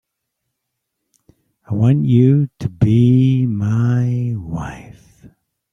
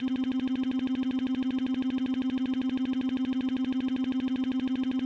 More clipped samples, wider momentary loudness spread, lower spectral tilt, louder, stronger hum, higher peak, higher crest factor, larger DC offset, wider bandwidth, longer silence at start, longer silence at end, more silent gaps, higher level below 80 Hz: neither; first, 14 LU vs 0 LU; first, -9.5 dB/octave vs -6 dB/octave; first, -16 LUFS vs -30 LUFS; second, none vs 50 Hz at -65 dBFS; first, -2 dBFS vs -22 dBFS; first, 14 dB vs 6 dB; neither; about the same, 6.8 kHz vs 6.4 kHz; first, 1.7 s vs 0 s; first, 0.45 s vs 0 s; neither; first, -46 dBFS vs -62 dBFS